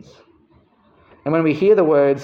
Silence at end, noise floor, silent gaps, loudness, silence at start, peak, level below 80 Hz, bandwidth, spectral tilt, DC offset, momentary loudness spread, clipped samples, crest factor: 0 s; -55 dBFS; none; -16 LUFS; 1.25 s; -4 dBFS; -62 dBFS; 6.4 kHz; -8.5 dB/octave; under 0.1%; 9 LU; under 0.1%; 14 dB